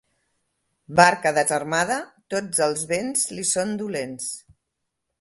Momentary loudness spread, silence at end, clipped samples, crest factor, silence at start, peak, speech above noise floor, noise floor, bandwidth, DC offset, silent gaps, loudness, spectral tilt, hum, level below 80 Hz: 13 LU; 0.8 s; under 0.1%; 24 dB; 0.9 s; 0 dBFS; 57 dB; -80 dBFS; 12 kHz; under 0.1%; none; -22 LUFS; -3 dB/octave; none; -64 dBFS